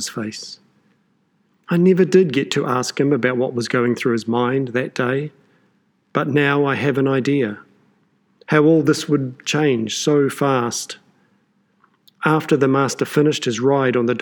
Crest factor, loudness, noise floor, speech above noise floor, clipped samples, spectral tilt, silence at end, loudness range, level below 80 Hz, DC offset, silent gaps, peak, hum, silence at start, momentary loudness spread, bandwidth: 18 dB; -18 LUFS; -63 dBFS; 45 dB; under 0.1%; -5.5 dB/octave; 0 s; 3 LU; -72 dBFS; under 0.1%; none; -2 dBFS; none; 0 s; 11 LU; 19 kHz